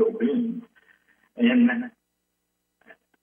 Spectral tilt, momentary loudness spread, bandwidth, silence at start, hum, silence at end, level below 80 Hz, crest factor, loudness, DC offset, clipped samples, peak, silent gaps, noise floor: -8.5 dB/octave; 17 LU; 3.6 kHz; 0 s; 60 Hz at -35 dBFS; 1.35 s; -80 dBFS; 16 dB; -23 LUFS; under 0.1%; under 0.1%; -10 dBFS; none; -77 dBFS